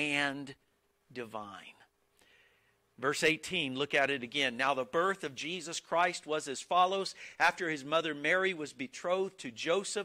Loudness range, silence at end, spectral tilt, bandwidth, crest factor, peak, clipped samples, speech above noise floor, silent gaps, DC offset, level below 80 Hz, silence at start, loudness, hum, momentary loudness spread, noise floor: 5 LU; 0 s; -3 dB/octave; 16 kHz; 20 dB; -14 dBFS; under 0.1%; 38 dB; none; under 0.1%; -76 dBFS; 0 s; -32 LUFS; none; 14 LU; -71 dBFS